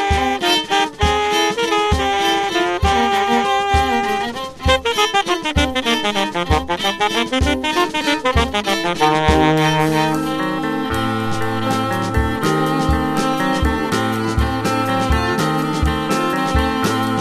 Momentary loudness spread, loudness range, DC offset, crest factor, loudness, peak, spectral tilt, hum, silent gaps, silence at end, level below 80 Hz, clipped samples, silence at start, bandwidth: 4 LU; 2 LU; under 0.1%; 16 dB; -17 LUFS; -2 dBFS; -4.5 dB/octave; none; none; 0 s; -28 dBFS; under 0.1%; 0 s; 14 kHz